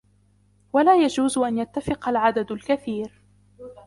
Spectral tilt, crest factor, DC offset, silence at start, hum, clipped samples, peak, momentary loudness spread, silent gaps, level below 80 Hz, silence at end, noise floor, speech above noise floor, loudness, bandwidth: -5 dB/octave; 18 dB; under 0.1%; 0.75 s; 50 Hz at -50 dBFS; under 0.1%; -6 dBFS; 11 LU; none; -54 dBFS; 0.15 s; -60 dBFS; 39 dB; -22 LUFS; 11.5 kHz